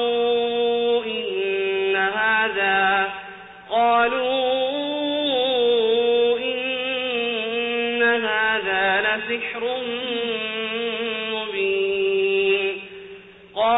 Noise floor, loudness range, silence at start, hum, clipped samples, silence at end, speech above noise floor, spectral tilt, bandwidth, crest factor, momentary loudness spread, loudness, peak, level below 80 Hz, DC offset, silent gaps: -43 dBFS; 3 LU; 0 s; none; under 0.1%; 0 s; 23 dB; -7 dB/octave; 4 kHz; 12 dB; 7 LU; -21 LUFS; -10 dBFS; -62 dBFS; under 0.1%; none